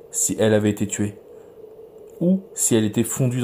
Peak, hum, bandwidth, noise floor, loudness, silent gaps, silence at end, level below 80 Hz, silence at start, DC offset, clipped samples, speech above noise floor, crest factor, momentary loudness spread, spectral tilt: -6 dBFS; none; 16 kHz; -43 dBFS; -21 LUFS; none; 0 s; -60 dBFS; 0.05 s; under 0.1%; under 0.1%; 22 dB; 16 dB; 6 LU; -5 dB/octave